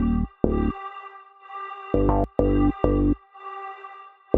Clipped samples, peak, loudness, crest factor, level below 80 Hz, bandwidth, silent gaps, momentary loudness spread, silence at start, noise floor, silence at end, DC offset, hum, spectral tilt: under 0.1%; -2 dBFS; -24 LUFS; 22 dB; -32 dBFS; 3.9 kHz; none; 19 LU; 0 s; -44 dBFS; 0 s; under 0.1%; none; -8.5 dB/octave